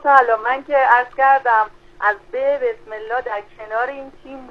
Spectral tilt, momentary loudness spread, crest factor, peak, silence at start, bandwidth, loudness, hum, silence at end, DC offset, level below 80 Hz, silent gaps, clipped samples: -4 dB/octave; 15 LU; 18 dB; 0 dBFS; 0.05 s; 6.8 kHz; -18 LUFS; none; 0 s; under 0.1%; -52 dBFS; none; under 0.1%